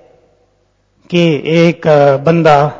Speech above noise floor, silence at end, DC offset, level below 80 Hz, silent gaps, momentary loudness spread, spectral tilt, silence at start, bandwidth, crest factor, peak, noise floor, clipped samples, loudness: 48 dB; 0 s; under 0.1%; -50 dBFS; none; 4 LU; -7 dB/octave; 1.1 s; 7.6 kHz; 12 dB; 0 dBFS; -57 dBFS; 0.5%; -10 LUFS